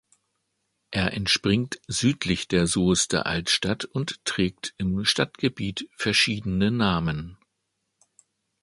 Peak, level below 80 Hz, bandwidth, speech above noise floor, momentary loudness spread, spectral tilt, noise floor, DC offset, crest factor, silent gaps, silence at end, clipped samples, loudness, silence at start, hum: -6 dBFS; -48 dBFS; 11.5 kHz; 53 dB; 8 LU; -4 dB/octave; -78 dBFS; under 0.1%; 20 dB; none; 1.3 s; under 0.1%; -24 LUFS; 0.9 s; none